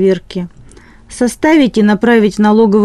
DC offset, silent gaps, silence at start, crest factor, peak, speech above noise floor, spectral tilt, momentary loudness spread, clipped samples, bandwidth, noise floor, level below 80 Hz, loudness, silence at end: under 0.1%; none; 0 s; 10 dB; 0 dBFS; 28 dB; -6 dB/octave; 14 LU; under 0.1%; 12.5 kHz; -38 dBFS; -42 dBFS; -11 LUFS; 0 s